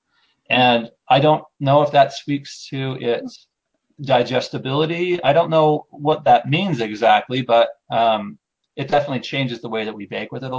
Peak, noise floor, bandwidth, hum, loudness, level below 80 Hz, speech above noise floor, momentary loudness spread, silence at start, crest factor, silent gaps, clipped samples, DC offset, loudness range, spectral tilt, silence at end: -2 dBFS; -65 dBFS; 8 kHz; none; -19 LUFS; -60 dBFS; 47 dB; 12 LU; 0.5 s; 18 dB; none; under 0.1%; under 0.1%; 4 LU; -6 dB/octave; 0 s